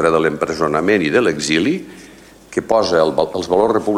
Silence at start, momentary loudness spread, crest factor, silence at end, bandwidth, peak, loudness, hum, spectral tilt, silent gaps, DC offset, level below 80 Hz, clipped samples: 0 s; 10 LU; 16 dB; 0 s; 15.5 kHz; 0 dBFS; -16 LUFS; none; -4.5 dB/octave; none; under 0.1%; -48 dBFS; under 0.1%